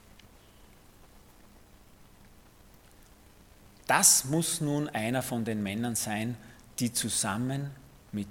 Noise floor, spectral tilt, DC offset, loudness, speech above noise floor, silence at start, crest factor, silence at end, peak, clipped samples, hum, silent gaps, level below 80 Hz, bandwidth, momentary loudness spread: -56 dBFS; -3 dB/octave; under 0.1%; -28 LUFS; 27 dB; 0.6 s; 26 dB; 0 s; -6 dBFS; under 0.1%; none; none; -60 dBFS; 17.5 kHz; 19 LU